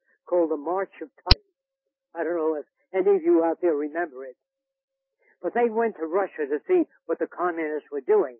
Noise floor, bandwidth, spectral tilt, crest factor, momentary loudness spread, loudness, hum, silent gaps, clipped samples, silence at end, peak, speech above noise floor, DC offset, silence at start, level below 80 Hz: -85 dBFS; 5.8 kHz; -9.5 dB/octave; 24 dB; 12 LU; -25 LUFS; none; 4.83-4.88 s; under 0.1%; 0.05 s; -2 dBFS; 60 dB; under 0.1%; 0.3 s; -40 dBFS